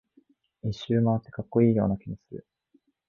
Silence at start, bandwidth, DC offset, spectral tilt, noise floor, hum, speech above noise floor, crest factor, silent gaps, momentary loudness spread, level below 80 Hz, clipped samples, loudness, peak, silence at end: 0.65 s; 7 kHz; under 0.1%; -9 dB/octave; -67 dBFS; none; 42 dB; 18 dB; none; 18 LU; -54 dBFS; under 0.1%; -26 LUFS; -10 dBFS; 0.7 s